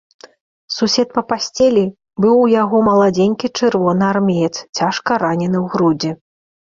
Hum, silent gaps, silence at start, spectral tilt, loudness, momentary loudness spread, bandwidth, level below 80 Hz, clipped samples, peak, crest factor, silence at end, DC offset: none; 4.69-4.73 s; 0.7 s; -5.5 dB/octave; -15 LUFS; 8 LU; 7.6 kHz; -54 dBFS; under 0.1%; -2 dBFS; 14 dB; 0.6 s; under 0.1%